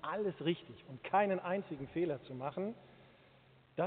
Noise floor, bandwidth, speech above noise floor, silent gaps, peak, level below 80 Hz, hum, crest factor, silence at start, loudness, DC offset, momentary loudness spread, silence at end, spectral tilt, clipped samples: -65 dBFS; 4.5 kHz; 27 dB; none; -18 dBFS; -74 dBFS; none; 20 dB; 0.05 s; -38 LUFS; under 0.1%; 15 LU; 0 s; -5 dB/octave; under 0.1%